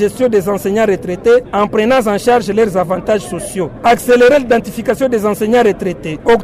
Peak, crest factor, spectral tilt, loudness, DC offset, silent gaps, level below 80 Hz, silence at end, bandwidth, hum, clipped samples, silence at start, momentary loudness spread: -2 dBFS; 10 dB; -5.5 dB/octave; -13 LUFS; under 0.1%; none; -40 dBFS; 0 s; 16 kHz; none; under 0.1%; 0 s; 9 LU